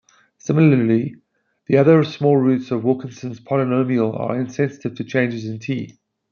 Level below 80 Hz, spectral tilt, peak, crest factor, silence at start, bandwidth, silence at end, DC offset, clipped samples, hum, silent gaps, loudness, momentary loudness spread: -64 dBFS; -8 dB/octave; -2 dBFS; 18 dB; 0.45 s; 7 kHz; 0.4 s; under 0.1%; under 0.1%; none; none; -19 LUFS; 14 LU